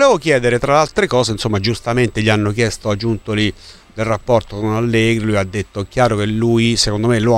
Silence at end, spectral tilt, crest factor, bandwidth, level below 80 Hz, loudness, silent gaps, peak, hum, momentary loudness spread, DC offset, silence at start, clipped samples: 0 s; -5.5 dB/octave; 16 dB; 13 kHz; -36 dBFS; -16 LUFS; none; 0 dBFS; none; 7 LU; under 0.1%; 0 s; under 0.1%